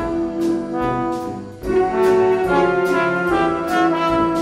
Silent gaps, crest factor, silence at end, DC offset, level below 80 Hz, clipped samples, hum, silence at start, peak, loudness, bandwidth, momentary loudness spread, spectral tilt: none; 14 dB; 0 s; under 0.1%; -42 dBFS; under 0.1%; none; 0 s; -2 dBFS; -18 LUFS; 15.5 kHz; 6 LU; -6.5 dB/octave